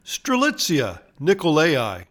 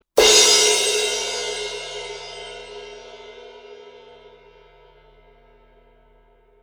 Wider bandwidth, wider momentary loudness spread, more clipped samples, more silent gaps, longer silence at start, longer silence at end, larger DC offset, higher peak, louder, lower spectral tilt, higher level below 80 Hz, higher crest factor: about the same, 19 kHz vs over 20 kHz; second, 7 LU vs 28 LU; neither; neither; about the same, 0.05 s vs 0.15 s; second, 0.05 s vs 2.7 s; neither; second, -4 dBFS vs 0 dBFS; second, -20 LUFS vs -16 LUFS; first, -4 dB/octave vs 1 dB/octave; about the same, -56 dBFS vs -54 dBFS; second, 16 dB vs 22 dB